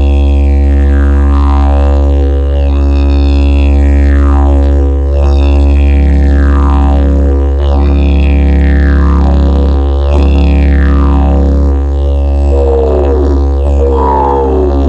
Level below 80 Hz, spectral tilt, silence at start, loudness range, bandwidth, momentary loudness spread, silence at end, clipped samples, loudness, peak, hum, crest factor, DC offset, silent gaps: -8 dBFS; -9 dB/octave; 0 s; 1 LU; 5.2 kHz; 2 LU; 0 s; 0.1%; -9 LUFS; 0 dBFS; none; 6 dB; under 0.1%; none